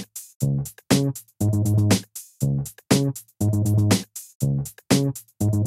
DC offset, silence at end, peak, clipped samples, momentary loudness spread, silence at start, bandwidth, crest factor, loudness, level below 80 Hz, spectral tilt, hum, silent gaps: under 0.1%; 0 s; -4 dBFS; under 0.1%; 8 LU; 0 s; 16 kHz; 20 dB; -23 LUFS; -48 dBFS; -5.5 dB/octave; none; 0.35-0.40 s, 4.35-4.40 s